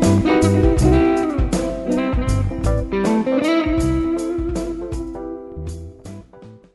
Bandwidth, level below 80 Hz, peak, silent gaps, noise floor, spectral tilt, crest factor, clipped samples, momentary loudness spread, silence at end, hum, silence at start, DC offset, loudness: 12 kHz; -26 dBFS; -2 dBFS; none; -42 dBFS; -7 dB/octave; 16 dB; under 0.1%; 16 LU; 0.15 s; none; 0 s; under 0.1%; -19 LUFS